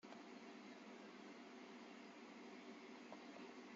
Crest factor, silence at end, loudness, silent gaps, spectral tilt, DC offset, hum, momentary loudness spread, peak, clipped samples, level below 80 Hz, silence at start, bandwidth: 18 dB; 0 s; -58 LUFS; none; -2.5 dB/octave; under 0.1%; none; 1 LU; -42 dBFS; under 0.1%; under -90 dBFS; 0.05 s; 7.6 kHz